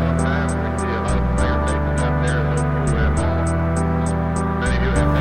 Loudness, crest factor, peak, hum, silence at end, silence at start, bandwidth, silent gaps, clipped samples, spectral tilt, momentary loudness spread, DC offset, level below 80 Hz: -20 LUFS; 14 dB; -4 dBFS; none; 0 s; 0 s; 10.5 kHz; none; under 0.1%; -6.5 dB/octave; 2 LU; 2%; -24 dBFS